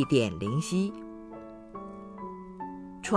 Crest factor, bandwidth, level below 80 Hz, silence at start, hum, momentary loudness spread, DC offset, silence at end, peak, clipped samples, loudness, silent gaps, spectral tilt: 22 dB; 11 kHz; -58 dBFS; 0 s; none; 17 LU; under 0.1%; 0 s; -8 dBFS; under 0.1%; -33 LUFS; none; -6 dB/octave